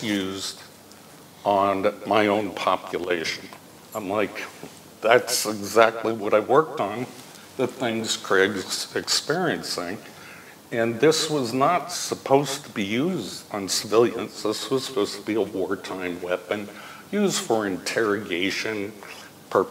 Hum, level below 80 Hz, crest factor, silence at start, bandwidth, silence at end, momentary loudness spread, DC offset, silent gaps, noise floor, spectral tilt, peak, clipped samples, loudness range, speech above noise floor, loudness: none; -70 dBFS; 24 dB; 0 s; 16 kHz; 0 s; 16 LU; under 0.1%; none; -47 dBFS; -3.5 dB/octave; -2 dBFS; under 0.1%; 4 LU; 23 dB; -24 LUFS